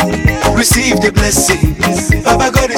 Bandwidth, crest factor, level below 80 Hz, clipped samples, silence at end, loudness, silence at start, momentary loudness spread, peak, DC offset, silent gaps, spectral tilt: 18 kHz; 12 dB; -20 dBFS; under 0.1%; 0 s; -11 LUFS; 0 s; 3 LU; 0 dBFS; under 0.1%; none; -4 dB/octave